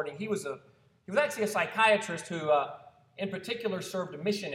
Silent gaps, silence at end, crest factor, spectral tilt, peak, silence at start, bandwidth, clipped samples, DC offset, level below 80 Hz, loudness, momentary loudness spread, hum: none; 0 s; 22 dB; -4 dB/octave; -10 dBFS; 0 s; 16 kHz; under 0.1%; under 0.1%; -76 dBFS; -30 LUFS; 14 LU; none